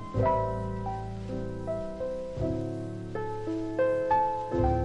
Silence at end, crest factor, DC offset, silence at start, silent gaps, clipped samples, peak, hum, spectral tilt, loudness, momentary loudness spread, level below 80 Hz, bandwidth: 0 s; 16 dB; under 0.1%; 0 s; none; under 0.1%; -14 dBFS; none; -8.5 dB/octave; -31 LUFS; 9 LU; -42 dBFS; 10 kHz